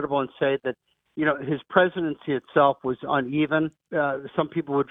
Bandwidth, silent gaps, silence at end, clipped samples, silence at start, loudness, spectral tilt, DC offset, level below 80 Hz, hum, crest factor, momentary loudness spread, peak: 3.9 kHz; none; 0.05 s; under 0.1%; 0 s; -25 LUFS; -9 dB/octave; under 0.1%; -64 dBFS; none; 20 dB; 8 LU; -4 dBFS